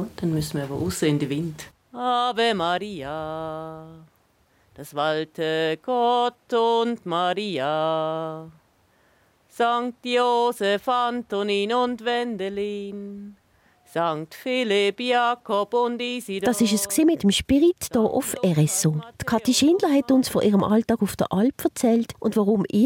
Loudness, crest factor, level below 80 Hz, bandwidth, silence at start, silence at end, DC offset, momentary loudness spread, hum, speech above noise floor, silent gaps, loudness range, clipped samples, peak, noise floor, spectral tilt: -23 LUFS; 14 dB; -56 dBFS; 17 kHz; 0 s; 0 s; under 0.1%; 11 LU; none; 40 dB; none; 6 LU; under 0.1%; -8 dBFS; -63 dBFS; -5 dB/octave